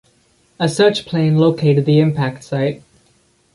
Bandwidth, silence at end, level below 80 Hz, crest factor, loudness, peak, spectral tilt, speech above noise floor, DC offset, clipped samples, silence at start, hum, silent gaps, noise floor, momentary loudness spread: 11.5 kHz; 0.75 s; -56 dBFS; 16 dB; -16 LUFS; -2 dBFS; -7 dB/octave; 42 dB; under 0.1%; under 0.1%; 0.6 s; none; none; -57 dBFS; 8 LU